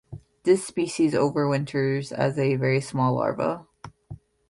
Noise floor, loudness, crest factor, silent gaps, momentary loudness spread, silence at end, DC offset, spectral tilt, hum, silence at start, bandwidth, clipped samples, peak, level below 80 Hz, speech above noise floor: -45 dBFS; -24 LUFS; 18 dB; none; 7 LU; 0.35 s; under 0.1%; -6.5 dB/octave; none; 0.1 s; 11.5 kHz; under 0.1%; -8 dBFS; -60 dBFS; 21 dB